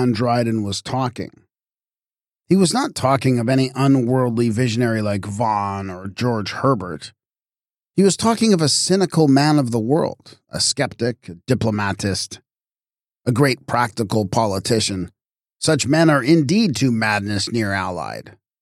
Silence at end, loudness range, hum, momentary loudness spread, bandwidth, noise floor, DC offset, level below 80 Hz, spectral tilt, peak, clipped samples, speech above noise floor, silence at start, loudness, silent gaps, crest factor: 0.3 s; 5 LU; none; 13 LU; 15 kHz; under -90 dBFS; under 0.1%; -56 dBFS; -5 dB/octave; -4 dBFS; under 0.1%; over 72 dB; 0 s; -19 LUFS; none; 16 dB